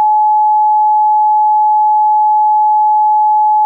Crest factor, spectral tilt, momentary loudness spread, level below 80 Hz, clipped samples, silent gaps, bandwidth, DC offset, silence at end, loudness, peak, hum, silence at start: 4 dB; 0 dB/octave; 0 LU; under -90 dBFS; under 0.1%; none; 1 kHz; under 0.1%; 0 s; -10 LUFS; -6 dBFS; none; 0 s